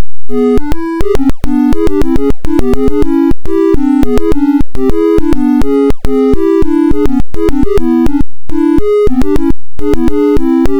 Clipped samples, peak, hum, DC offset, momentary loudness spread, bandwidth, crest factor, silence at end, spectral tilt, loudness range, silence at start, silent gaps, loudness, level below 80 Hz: 2%; 0 dBFS; none; 40%; 4 LU; 13.5 kHz; 10 dB; 0 s; -8 dB/octave; 1 LU; 0 s; none; -12 LUFS; -18 dBFS